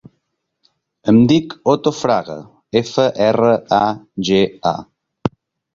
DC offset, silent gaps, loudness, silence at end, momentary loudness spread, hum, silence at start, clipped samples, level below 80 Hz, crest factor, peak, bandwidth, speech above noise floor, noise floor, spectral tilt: under 0.1%; none; -16 LUFS; 0.45 s; 12 LU; none; 1.05 s; under 0.1%; -52 dBFS; 16 dB; 0 dBFS; 7.6 kHz; 56 dB; -71 dBFS; -6.5 dB/octave